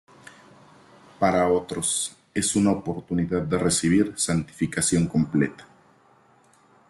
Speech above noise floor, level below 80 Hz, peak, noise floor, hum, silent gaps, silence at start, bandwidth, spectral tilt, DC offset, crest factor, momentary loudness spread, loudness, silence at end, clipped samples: 35 dB; -56 dBFS; -8 dBFS; -58 dBFS; none; none; 1.2 s; 12.5 kHz; -4.5 dB/octave; under 0.1%; 18 dB; 7 LU; -24 LUFS; 1.25 s; under 0.1%